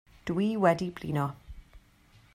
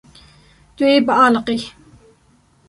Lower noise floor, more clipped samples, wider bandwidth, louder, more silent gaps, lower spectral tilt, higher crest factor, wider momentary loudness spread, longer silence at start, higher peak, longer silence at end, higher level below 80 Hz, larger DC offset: first, -60 dBFS vs -55 dBFS; neither; first, 15.5 kHz vs 11.5 kHz; second, -29 LUFS vs -15 LUFS; neither; first, -7.5 dB/octave vs -4.5 dB/octave; first, 22 dB vs 16 dB; about the same, 10 LU vs 12 LU; second, 0.25 s vs 0.8 s; second, -10 dBFS vs -2 dBFS; second, 0.55 s vs 1 s; about the same, -54 dBFS vs -54 dBFS; neither